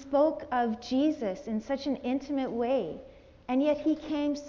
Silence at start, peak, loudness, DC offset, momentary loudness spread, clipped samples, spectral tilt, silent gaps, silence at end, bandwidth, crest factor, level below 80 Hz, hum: 0 s; -14 dBFS; -30 LUFS; under 0.1%; 8 LU; under 0.1%; -6 dB/octave; none; 0 s; 7.4 kHz; 16 dB; -60 dBFS; none